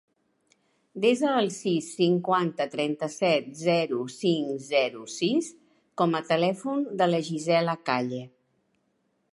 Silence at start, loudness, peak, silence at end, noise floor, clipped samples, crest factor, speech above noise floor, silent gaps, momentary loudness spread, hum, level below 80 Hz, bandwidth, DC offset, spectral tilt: 0.95 s; -26 LUFS; -8 dBFS; 1.05 s; -73 dBFS; under 0.1%; 18 dB; 47 dB; none; 5 LU; none; -78 dBFS; 11.5 kHz; under 0.1%; -5 dB/octave